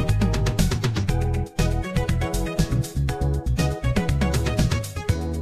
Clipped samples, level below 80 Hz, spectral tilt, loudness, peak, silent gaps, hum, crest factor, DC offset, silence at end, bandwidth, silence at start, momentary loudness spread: under 0.1%; -28 dBFS; -6 dB/octave; -24 LUFS; -8 dBFS; none; none; 14 dB; under 0.1%; 0 s; 14.5 kHz; 0 s; 3 LU